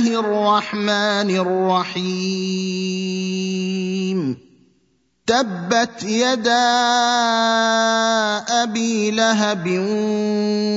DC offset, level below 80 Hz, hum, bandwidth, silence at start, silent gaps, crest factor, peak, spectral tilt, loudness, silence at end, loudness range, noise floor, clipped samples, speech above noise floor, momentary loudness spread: under 0.1%; -66 dBFS; none; 7.8 kHz; 0 s; none; 16 dB; -2 dBFS; -4 dB/octave; -19 LUFS; 0 s; 6 LU; -64 dBFS; under 0.1%; 45 dB; 7 LU